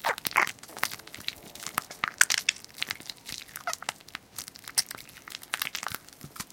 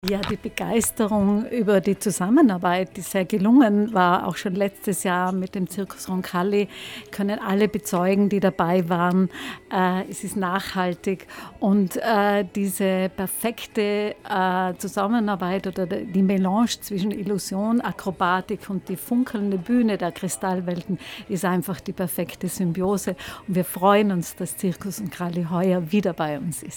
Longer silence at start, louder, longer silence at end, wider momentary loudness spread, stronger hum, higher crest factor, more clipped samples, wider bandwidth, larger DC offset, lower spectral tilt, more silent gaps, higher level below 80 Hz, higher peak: about the same, 0 s vs 0.05 s; second, -31 LUFS vs -23 LUFS; about the same, 0.1 s vs 0 s; first, 16 LU vs 9 LU; neither; first, 30 dB vs 18 dB; neither; second, 17 kHz vs 19 kHz; neither; second, 0.5 dB/octave vs -5.5 dB/octave; neither; second, -66 dBFS vs -54 dBFS; about the same, -2 dBFS vs -4 dBFS